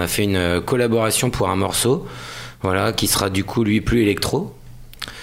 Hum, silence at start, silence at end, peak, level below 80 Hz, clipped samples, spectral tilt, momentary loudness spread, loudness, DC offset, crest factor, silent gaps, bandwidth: none; 0 s; 0 s; -2 dBFS; -38 dBFS; under 0.1%; -4.5 dB/octave; 15 LU; -19 LUFS; under 0.1%; 18 dB; none; 16 kHz